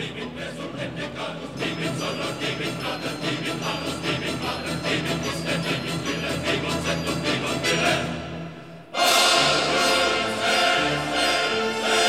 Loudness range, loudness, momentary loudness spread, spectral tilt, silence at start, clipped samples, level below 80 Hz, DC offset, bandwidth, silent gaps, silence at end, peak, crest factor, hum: 8 LU; -23 LUFS; 13 LU; -3 dB/octave; 0 s; under 0.1%; -50 dBFS; 0.2%; 17 kHz; none; 0 s; -6 dBFS; 18 dB; none